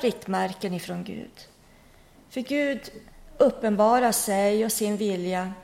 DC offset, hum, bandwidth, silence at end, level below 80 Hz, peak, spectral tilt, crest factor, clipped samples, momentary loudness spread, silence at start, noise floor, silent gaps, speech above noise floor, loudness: under 0.1%; none; 16.5 kHz; 0 s; -56 dBFS; -8 dBFS; -4.5 dB/octave; 18 dB; under 0.1%; 16 LU; 0 s; -54 dBFS; none; 29 dB; -25 LUFS